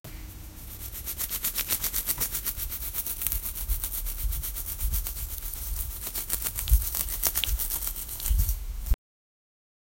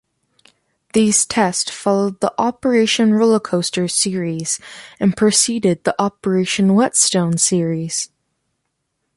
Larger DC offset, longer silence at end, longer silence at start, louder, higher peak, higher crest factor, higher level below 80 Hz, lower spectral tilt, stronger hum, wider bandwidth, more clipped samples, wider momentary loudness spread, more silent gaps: neither; about the same, 1.05 s vs 1.1 s; second, 0.05 s vs 0.95 s; second, -29 LUFS vs -16 LUFS; about the same, 0 dBFS vs 0 dBFS; first, 30 dB vs 18 dB; first, -32 dBFS vs -56 dBFS; second, -2 dB/octave vs -4 dB/octave; neither; first, 16.5 kHz vs 11.5 kHz; neither; about the same, 9 LU vs 8 LU; neither